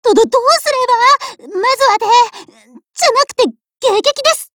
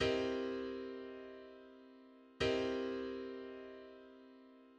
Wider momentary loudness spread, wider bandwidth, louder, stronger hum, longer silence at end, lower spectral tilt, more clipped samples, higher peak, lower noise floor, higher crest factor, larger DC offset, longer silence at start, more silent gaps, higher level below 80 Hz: second, 7 LU vs 23 LU; first, over 20 kHz vs 9.4 kHz; first, -12 LUFS vs -41 LUFS; neither; about the same, 0.1 s vs 0 s; second, -0.5 dB/octave vs -5 dB/octave; neither; first, 0 dBFS vs -24 dBFS; second, -43 dBFS vs -61 dBFS; second, 12 dB vs 18 dB; neither; about the same, 0.05 s vs 0 s; neither; first, -58 dBFS vs -64 dBFS